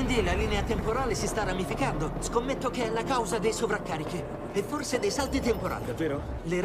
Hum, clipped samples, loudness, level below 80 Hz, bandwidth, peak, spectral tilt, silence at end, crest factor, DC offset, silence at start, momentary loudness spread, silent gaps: none; under 0.1%; -29 LUFS; -38 dBFS; 16 kHz; -14 dBFS; -5 dB/octave; 0 s; 16 dB; under 0.1%; 0 s; 5 LU; none